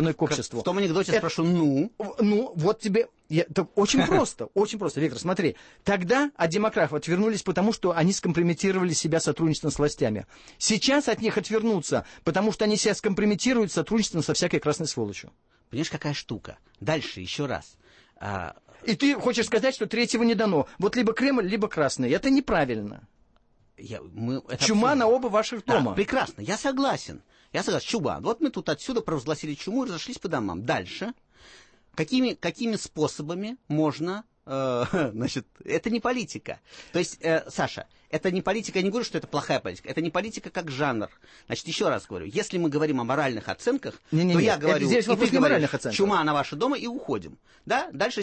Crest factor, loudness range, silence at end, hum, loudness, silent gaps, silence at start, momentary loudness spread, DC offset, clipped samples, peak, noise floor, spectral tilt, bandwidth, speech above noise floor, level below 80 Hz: 18 dB; 5 LU; 0 s; none; -26 LUFS; none; 0 s; 11 LU; under 0.1%; under 0.1%; -8 dBFS; -62 dBFS; -5 dB/octave; 8.8 kHz; 37 dB; -56 dBFS